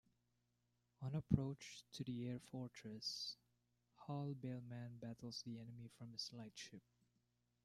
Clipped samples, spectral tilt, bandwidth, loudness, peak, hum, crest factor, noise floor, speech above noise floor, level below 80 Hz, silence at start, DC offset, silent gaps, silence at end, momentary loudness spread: under 0.1%; -5.5 dB/octave; 14 kHz; -49 LUFS; -20 dBFS; 60 Hz at -65 dBFS; 28 dB; -85 dBFS; 37 dB; -72 dBFS; 1 s; under 0.1%; none; 0.85 s; 15 LU